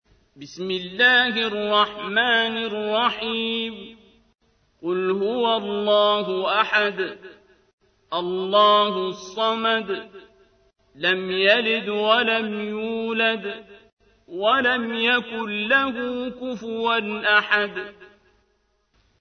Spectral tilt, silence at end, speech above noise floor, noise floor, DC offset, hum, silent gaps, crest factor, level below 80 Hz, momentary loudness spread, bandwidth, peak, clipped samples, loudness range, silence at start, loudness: -4.5 dB/octave; 1.15 s; 46 dB; -68 dBFS; under 0.1%; none; 7.73-7.78 s, 13.92-13.97 s; 20 dB; -64 dBFS; 13 LU; 6.6 kHz; -4 dBFS; under 0.1%; 3 LU; 0.4 s; -21 LUFS